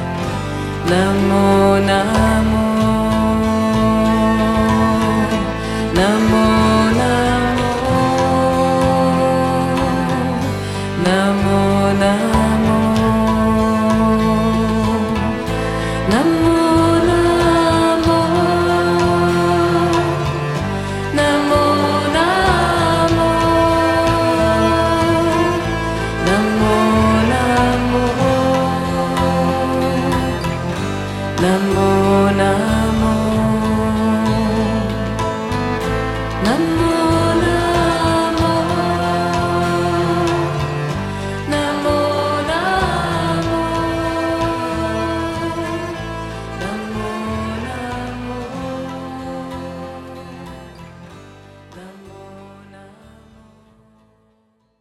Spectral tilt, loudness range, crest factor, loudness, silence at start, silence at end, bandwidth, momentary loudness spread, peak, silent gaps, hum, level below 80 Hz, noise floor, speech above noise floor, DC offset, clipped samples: -6 dB/octave; 9 LU; 16 dB; -16 LUFS; 0 s; 1.95 s; 15 kHz; 10 LU; 0 dBFS; none; none; -32 dBFS; -61 dBFS; 47 dB; under 0.1%; under 0.1%